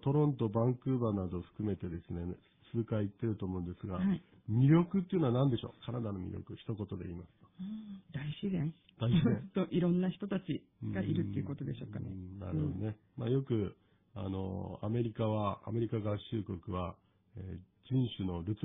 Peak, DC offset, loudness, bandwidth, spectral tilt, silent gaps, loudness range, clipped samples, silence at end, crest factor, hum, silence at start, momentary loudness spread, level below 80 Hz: -16 dBFS; under 0.1%; -36 LUFS; 3.9 kHz; -11.5 dB/octave; none; 6 LU; under 0.1%; 0 s; 18 dB; none; 0 s; 14 LU; -60 dBFS